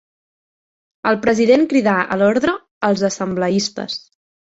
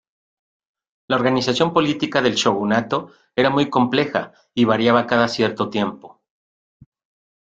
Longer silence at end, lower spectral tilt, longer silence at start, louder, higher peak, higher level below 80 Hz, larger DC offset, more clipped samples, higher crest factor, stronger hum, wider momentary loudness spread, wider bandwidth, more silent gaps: second, 0.6 s vs 1.35 s; about the same, -5 dB/octave vs -5 dB/octave; about the same, 1.05 s vs 1.1 s; about the same, -17 LUFS vs -19 LUFS; about the same, -2 dBFS vs -2 dBFS; about the same, -56 dBFS vs -58 dBFS; neither; neither; about the same, 16 dB vs 18 dB; neither; about the same, 10 LU vs 9 LU; second, 8 kHz vs 9 kHz; first, 2.71-2.81 s vs none